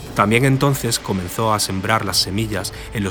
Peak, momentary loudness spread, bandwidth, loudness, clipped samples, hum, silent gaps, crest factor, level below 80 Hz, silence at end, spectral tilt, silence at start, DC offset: 0 dBFS; 9 LU; over 20 kHz; -18 LUFS; under 0.1%; none; none; 18 dB; -40 dBFS; 0 s; -4.5 dB/octave; 0 s; under 0.1%